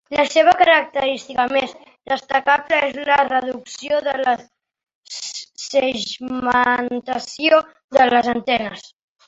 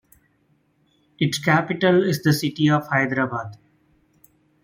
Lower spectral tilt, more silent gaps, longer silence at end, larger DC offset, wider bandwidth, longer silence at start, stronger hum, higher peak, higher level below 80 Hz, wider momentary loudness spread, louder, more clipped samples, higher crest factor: second, -2.5 dB/octave vs -5.5 dB/octave; first, 4.95-5.03 s, 7.84-7.89 s vs none; second, 0.4 s vs 1.1 s; neither; second, 8 kHz vs 16.5 kHz; second, 0.1 s vs 1.2 s; neither; about the same, -2 dBFS vs -4 dBFS; about the same, -58 dBFS vs -62 dBFS; first, 14 LU vs 7 LU; first, -18 LUFS vs -21 LUFS; neither; about the same, 18 dB vs 20 dB